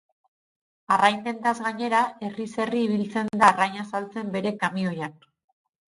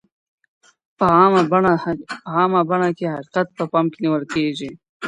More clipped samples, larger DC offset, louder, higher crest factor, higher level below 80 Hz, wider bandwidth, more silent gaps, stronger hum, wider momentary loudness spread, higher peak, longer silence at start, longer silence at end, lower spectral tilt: neither; neither; second, -24 LUFS vs -18 LUFS; first, 24 dB vs 18 dB; second, -66 dBFS vs -56 dBFS; about the same, 11.5 kHz vs 10.5 kHz; second, none vs 4.89-5.00 s; neither; about the same, 12 LU vs 12 LU; about the same, -2 dBFS vs -2 dBFS; about the same, 0.9 s vs 1 s; first, 0.8 s vs 0 s; second, -5 dB/octave vs -7 dB/octave